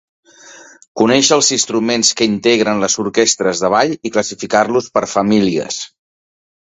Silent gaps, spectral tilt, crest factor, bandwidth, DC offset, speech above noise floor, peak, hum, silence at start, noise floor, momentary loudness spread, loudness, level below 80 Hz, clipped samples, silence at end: 0.88-0.95 s; -3 dB/octave; 16 dB; 8.4 kHz; under 0.1%; 26 dB; 0 dBFS; none; 0.45 s; -40 dBFS; 8 LU; -14 LUFS; -54 dBFS; under 0.1%; 0.8 s